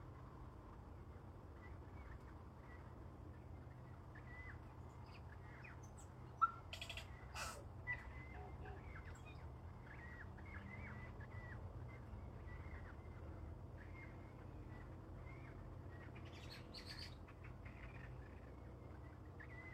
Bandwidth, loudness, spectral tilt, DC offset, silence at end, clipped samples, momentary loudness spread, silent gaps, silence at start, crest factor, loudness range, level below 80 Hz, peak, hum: 15 kHz; -54 LUFS; -5 dB/octave; under 0.1%; 0 s; under 0.1%; 8 LU; none; 0 s; 28 dB; 9 LU; -60 dBFS; -24 dBFS; none